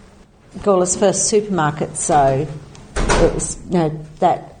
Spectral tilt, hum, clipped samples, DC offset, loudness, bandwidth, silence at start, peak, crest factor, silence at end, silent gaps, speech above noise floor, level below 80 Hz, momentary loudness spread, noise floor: -4.5 dB/octave; none; under 0.1%; under 0.1%; -18 LUFS; 9.8 kHz; 0.55 s; -2 dBFS; 16 dB; 0.05 s; none; 29 dB; -30 dBFS; 9 LU; -46 dBFS